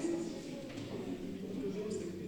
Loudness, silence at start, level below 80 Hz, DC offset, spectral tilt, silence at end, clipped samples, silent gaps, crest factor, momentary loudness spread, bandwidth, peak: -41 LUFS; 0 s; -66 dBFS; under 0.1%; -6 dB/octave; 0 s; under 0.1%; none; 14 dB; 5 LU; 19 kHz; -26 dBFS